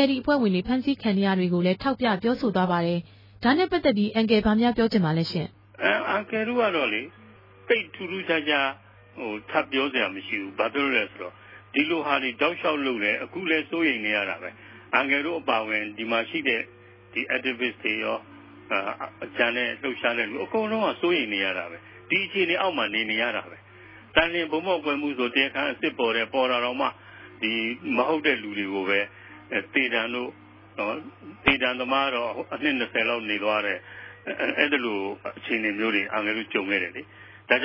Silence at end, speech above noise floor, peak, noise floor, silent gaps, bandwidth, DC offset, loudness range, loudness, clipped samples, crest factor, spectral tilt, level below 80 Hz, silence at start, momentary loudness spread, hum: 0 s; 23 dB; -2 dBFS; -48 dBFS; none; 5.8 kHz; under 0.1%; 3 LU; -25 LUFS; under 0.1%; 24 dB; -7.5 dB/octave; -56 dBFS; 0 s; 10 LU; none